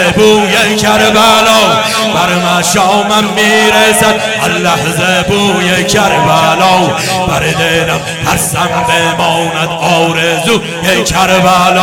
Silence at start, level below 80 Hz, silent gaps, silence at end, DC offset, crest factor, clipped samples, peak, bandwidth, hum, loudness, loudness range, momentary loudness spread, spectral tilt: 0 s; -36 dBFS; none; 0 s; under 0.1%; 8 dB; 0.6%; 0 dBFS; over 20 kHz; none; -8 LUFS; 3 LU; 5 LU; -3.5 dB/octave